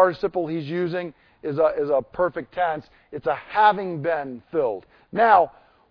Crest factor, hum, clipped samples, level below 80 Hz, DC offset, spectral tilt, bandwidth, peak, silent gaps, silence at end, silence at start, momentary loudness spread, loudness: 20 dB; none; under 0.1%; -58 dBFS; under 0.1%; -8.5 dB/octave; 5.4 kHz; -4 dBFS; none; 0.4 s; 0 s; 14 LU; -23 LUFS